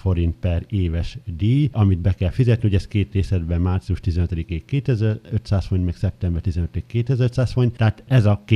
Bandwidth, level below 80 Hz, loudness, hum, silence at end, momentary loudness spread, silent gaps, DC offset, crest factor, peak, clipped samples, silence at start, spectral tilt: 9.4 kHz; -32 dBFS; -21 LUFS; none; 0 s; 7 LU; none; under 0.1%; 16 dB; -2 dBFS; under 0.1%; 0.05 s; -8.5 dB/octave